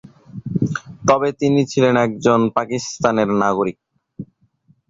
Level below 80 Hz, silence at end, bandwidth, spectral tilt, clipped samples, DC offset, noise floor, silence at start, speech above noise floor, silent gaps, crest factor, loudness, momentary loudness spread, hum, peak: -52 dBFS; 0.65 s; 7.8 kHz; -6 dB/octave; under 0.1%; under 0.1%; -58 dBFS; 0.35 s; 41 dB; none; 16 dB; -18 LUFS; 21 LU; none; -2 dBFS